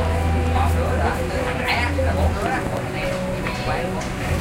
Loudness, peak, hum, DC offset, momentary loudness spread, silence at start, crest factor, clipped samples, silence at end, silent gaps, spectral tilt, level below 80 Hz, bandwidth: -22 LUFS; -6 dBFS; none; under 0.1%; 5 LU; 0 s; 14 dB; under 0.1%; 0 s; none; -6 dB/octave; -28 dBFS; 16 kHz